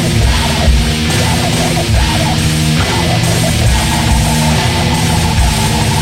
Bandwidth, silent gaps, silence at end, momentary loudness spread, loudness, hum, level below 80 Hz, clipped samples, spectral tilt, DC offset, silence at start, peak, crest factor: 16.5 kHz; none; 0 s; 1 LU; -12 LUFS; none; -18 dBFS; under 0.1%; -4.5 dB/octave; under 0.1%; 0 s; 0 dBFS; 12 dB